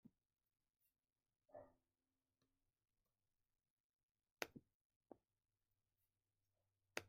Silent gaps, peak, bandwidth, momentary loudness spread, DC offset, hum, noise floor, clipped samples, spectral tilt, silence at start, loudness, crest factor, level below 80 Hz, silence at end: 3.70-4.15 s, 4.32-4.37 s, 4.74-4.90 s, 4.96-5.01 s; -26 dBFS; 14.5 kHz; 13 LU; under 0.1%; none; under -90 dBFS; under 0.1%; -2.5 dB/octave; 0.05 s; -57 LUFS; 38 dB; under -90 dBFS; 0 s